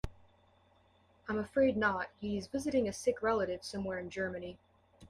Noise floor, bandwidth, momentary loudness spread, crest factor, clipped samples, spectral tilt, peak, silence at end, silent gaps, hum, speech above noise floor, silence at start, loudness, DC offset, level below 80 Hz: -68 dBFS; 14.5 kHz; 11 LU; 18 dB; under 0.1%; -5 dB/octave; -18 dBFS; 0.05 s; none; none; 34 dB; 0.05 s; -35 LUFS; under 0.1%; -58 dBFS